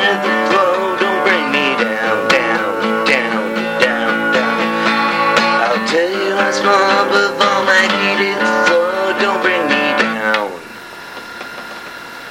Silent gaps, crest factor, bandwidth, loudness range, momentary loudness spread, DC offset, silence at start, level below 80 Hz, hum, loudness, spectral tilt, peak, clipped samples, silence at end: none; 14 dB; 16.5 kHz; 3 LU; 16 LU; under 0.1%; 0 s; -58 dBFS; none; -14 LUFS; -3.5 dB/octave; 0 dBFS; under 0.1%; 0 s